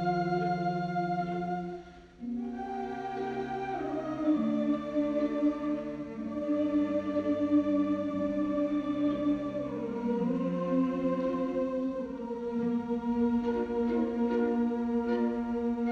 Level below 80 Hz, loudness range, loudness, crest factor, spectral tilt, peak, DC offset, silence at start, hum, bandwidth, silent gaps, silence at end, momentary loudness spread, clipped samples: -58 dBFS; 4 LU; -31 LUFS; 14 dB; -8.5 dB/octave; -18 dBFS; under 0.1%; 0 s; none; 6.8 kHz; none; 0 s; 8 LU; under 0.1%